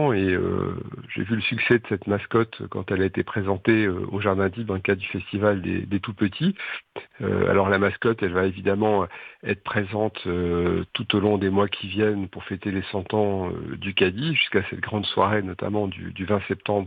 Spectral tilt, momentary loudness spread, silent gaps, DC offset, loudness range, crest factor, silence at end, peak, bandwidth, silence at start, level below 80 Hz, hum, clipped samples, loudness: -9 dB/octave; 9 LU; none; under 0.1%; 1 LU; 20 dB; 0 s; -4 dBFS; 4.9 kHz; 0 s; -54 dBFS; none; under 0.1%; -24 LUFS